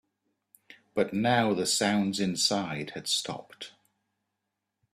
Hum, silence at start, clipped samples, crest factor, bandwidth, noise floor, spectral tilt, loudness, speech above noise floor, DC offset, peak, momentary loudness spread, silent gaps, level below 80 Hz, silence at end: none; 0.7 s; under 0.1%; 20 dB; 14.5 kHz; -84 dBFS; -3.5 dB/octave; -28 LUFS; 56 dB; under 0.1%; -10 dBFS; 15 LU; none; -68 dBFS; 1.25 s